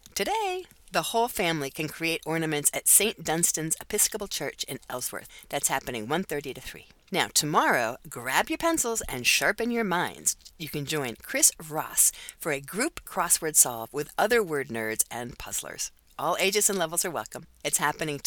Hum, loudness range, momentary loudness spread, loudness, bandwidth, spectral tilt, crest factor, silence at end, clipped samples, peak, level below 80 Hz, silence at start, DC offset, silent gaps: none; 4 LU; 13 LU; -26 LUFS; 19 kHz; -2 dB/octave; 24 dB; 0.05 s; under 0.1%; -4 dBFS; -56 dBFS; 0.15 s; under 0.1%; none